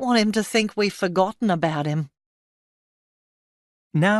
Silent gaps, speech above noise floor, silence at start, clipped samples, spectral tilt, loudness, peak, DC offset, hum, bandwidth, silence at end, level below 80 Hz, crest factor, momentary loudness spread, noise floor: 2.26-3.90 s; over 69 dB; 0 s; under 0.1%; -5.5 dB/octave; -23 LUFS; -6 dBFS; under 0.1%; none; 12 kHz; 0 s; -66 dBFS; 18 dB; 8 LU; under -90 dBFS